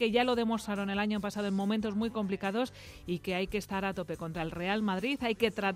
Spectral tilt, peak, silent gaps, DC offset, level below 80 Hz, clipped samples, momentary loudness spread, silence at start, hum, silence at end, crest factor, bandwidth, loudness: -5.5 dB/octave; -14 dBFS; none; under 0.1%; -56 dBFS; under 0.1%; 7 LU; 0 s; none; 0 s; 18 dB; 15.5 kHz; -33 LUFS